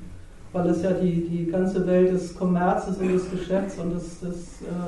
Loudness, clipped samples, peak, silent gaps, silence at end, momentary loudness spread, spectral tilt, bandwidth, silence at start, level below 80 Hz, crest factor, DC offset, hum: -25 LUFS; under 0.1%; -10 dBFS; none; 0 s; 13 LU; -8 dB/octave; 11 kHz; 0 s; -44 dBFS; 14 dB; under 0.1%; none